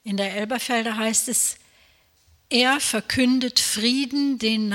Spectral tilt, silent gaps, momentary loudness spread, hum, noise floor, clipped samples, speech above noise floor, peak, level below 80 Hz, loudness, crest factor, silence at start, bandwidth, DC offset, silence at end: -2 dB/octave; none; 6 LU; none; -60 dBFS; under 0.1%; 37 dB; -6 dBFS; -60 dBFS; -21 LUFS; 18 dB; 0.05 s; 17 kHz; under 0.1%; 0 s